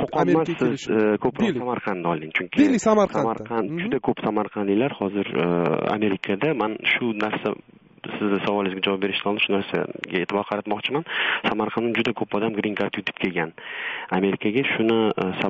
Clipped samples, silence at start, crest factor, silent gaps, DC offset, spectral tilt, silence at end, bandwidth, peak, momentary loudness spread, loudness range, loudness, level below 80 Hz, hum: under 0.1%; 0 s; 18 dB; none; under 0.1%; -4 dB/octave; 0 s; 8 kHz; -6 dBFS; 7 LU; 3 LU; -23 LUFS; -60 dBFS; none